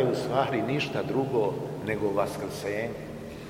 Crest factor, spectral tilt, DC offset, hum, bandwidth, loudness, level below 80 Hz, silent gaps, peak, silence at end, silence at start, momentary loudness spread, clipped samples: 18 dB; -6 dB/octave; under 0.1%; none; 16 kHz; -29 LUFS; -56 dBFS; none; -10 dBFS; 0 s; 0 s; 7 LU; under 0.1%